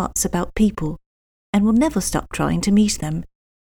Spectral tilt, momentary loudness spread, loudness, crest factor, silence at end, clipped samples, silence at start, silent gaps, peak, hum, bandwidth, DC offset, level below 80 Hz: -5 dB/octave; 11 LU; -20 LUFS; 16 dB; 0.4 s; under 0.1%; 0 s; 1.06-1.53 s; -4 dBFS; none; 18.5 kHz; under 0.1%; -36 dBFS